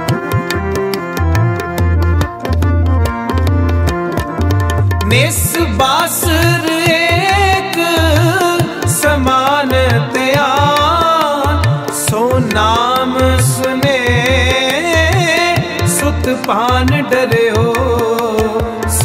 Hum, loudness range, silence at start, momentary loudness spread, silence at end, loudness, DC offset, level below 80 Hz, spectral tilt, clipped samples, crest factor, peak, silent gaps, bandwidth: none; 3 LU; 0 s; 5 LU; 0 s; -13 LUFS; under 0.1%; -24 dBFS; -4.5 dB/octave; under 0.1%; 12 dB; 0 dBFS; none; 16.5 kHz